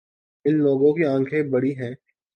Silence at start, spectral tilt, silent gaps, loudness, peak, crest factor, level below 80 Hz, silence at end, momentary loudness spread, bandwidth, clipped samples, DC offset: 0.45 s; -9.5 dB/octave; none; -21 LUFS; -8 dBFS; 14 dB; -70 dBFS; 0.4 s; 10 LU; 5.8 kHz; under 0.1%; under 0.1%